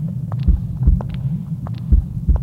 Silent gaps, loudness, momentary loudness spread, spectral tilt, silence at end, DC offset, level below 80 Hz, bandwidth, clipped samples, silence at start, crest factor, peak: none; -21 LUFS; 6 LU; -10.5 dB/octave; 0 s; under 0.1%; -20 dBFS; 4.3 kHz; under 0.1%; 0 s; 16 dB; -2 dBFS